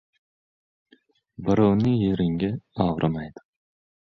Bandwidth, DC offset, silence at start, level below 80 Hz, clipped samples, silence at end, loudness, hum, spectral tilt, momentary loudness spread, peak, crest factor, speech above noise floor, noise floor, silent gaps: 6.4 kHz; under 0.1%; 1.4 s; -50 dBFS; under 0.1%; 0.75 s; -24 LUFS; none; -9 dB/octave; 12 LU; -6 dBFS; 18 dB; 39 dB; -61 dBFS; none